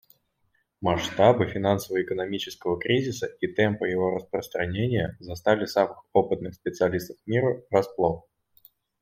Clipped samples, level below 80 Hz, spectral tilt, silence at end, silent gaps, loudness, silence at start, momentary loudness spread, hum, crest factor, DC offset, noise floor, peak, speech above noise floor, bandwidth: under 0.1%; -58 dBFS; -6 dB/octave; 0.8 s; none; -26 LUFS; 0.8 s; 8 LU; none; 22 dB; under 0.1%; -71 dBFS; -4 dBFS; 46 dB; 16.5 kHz